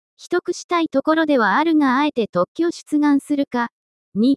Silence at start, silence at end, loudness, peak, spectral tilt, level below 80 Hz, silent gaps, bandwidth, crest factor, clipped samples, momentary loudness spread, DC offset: 0.2 s; 0 s; -19 LUFS; -6 dBFS; -5 dB/octave; -68 dBFS; 0.64-0.69 s, 2.29-2.33 s, 2.48-2.55 s, 3.72-4.12 s; 12 kHz; 14 dB; under 0.1%; 8 LU; under 0.1%